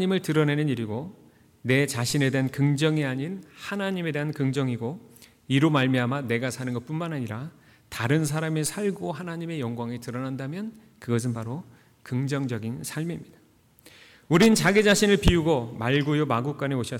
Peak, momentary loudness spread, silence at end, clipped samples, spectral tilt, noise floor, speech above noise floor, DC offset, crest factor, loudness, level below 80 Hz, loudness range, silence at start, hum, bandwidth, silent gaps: -8 dBFS; 15 LU; 0 s; under 0.1%; -5.5 dB/octave; -56 dBFS; 31 dB; under 0.1%; 18 dB; -25 LUFS; -44 dBFS; 9 LU; 0 s; none; 18 kHz; none